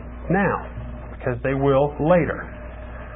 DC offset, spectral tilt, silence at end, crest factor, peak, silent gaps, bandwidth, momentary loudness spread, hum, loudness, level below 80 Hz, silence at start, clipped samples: under 0.1%; -12.5 dB/octave; 0 s; 18 dB; -4 dBFS; none; 3.8 kHz; 17 LU; none; -22 LUFS; -36 dBFS; 0 s; under 0.1%